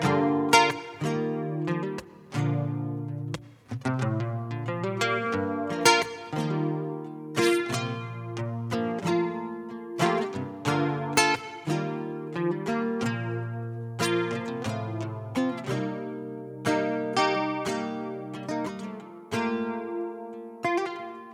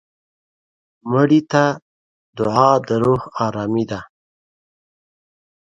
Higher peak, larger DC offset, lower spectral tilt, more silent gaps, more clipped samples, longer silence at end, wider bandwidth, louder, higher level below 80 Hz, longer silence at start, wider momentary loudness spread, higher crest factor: second, -6 dBFS vs 0 dBFS; neither; second, -5 dB/octave vs -7 dB/octave; second, none vs 1.82-2.33 s; neither; second, 0 s vs 1.7 s; first, over 20 kHz vs 7.8 kHz; second, -28 LUFS vs -18 LUFS; second, -68 dBFS vs -54 dBFS; second, 0 s vs 1.05 s; about the same, 12 LU vs 12 LU; about the same, 24 dB vs 20 dB